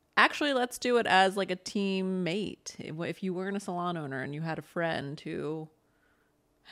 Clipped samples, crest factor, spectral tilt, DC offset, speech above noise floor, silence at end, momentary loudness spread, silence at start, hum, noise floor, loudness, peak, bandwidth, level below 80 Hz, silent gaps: under 0.1%; 24 dB; -4.5 dB/octave; under 0.1%; 39 dB; 0 s; 14 LU; 0.15 s; none; -71 dBFS; -30 LUFS; -6 dBFS; 15 kHz; -72 dBFS; none